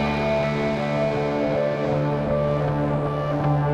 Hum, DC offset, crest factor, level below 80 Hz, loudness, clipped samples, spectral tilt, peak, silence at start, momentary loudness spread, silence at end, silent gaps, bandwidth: none; under 0.1%; 12 dB; -42 dBFS; -23 LUFS; under 0.1%; -8 dB/octave; -10 dBFS; 0 s; 1 LU; 0 s; none; 8 kHz